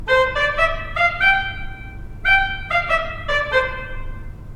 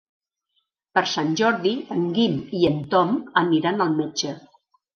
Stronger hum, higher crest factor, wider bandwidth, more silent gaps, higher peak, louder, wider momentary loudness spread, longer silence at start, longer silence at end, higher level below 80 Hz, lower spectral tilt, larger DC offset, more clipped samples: neither; about the same, 16 dB vs 20 dB; first, 12.5 kHz vs 7 kHz; neither; about the same, -4 dBFS vs -2 dBFS; first, -18 LUFS vs -22 LUFS; first, 19 LU vs 5 LU; second, 0 s vs 0.95 s; second, 0 s vs 0.55 s; first, -32 dBFS vs -62 dBFS; about the same, -4 dB/octave vs -5 dB/octave; neither; neither